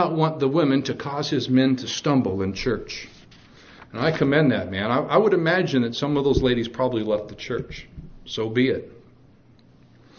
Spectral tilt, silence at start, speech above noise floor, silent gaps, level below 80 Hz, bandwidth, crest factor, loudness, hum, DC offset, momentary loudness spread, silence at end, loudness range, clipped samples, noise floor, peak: -6 dB/octave; 0 s; 31 dB; none; -46 dBFS; 6.8 kHz; 20 dB; -22 LUFS; none; under 0.1%; 14 LU; 1.25 s; 5 LU; under 0.1%; -53 dBFS; -4 dBFS